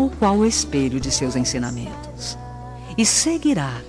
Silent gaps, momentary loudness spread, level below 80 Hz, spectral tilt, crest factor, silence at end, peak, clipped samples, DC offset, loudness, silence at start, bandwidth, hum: none; 15 LU; -38 dBFS; -3.5 dB/octave; 16 dB; 0 s; -4 dBFS; under 0.1%; 0.1%; -20 LUFS; 0 s; 13.5 kHz; none